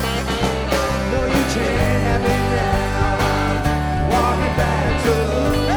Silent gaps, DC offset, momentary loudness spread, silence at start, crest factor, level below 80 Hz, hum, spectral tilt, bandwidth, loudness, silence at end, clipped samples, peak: none; under 0.1%; 2 LU; 0 s; 14 dB; -26 dBFS; none; -5.5 dB/octave; over 20 kHz; -19 LUFS; 0 s; under 0.1%; -4 dBFS